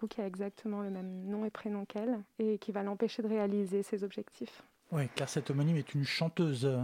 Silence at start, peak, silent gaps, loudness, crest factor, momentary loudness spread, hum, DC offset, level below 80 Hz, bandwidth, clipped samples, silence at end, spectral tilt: 0 s; -16 dBFS; none; -36 LUFS; 20 dB; 8 LU; none; under 0.1%; -78 dBFS; 16 kHz; under 0.1%; 0 s; -6.5 dB/octave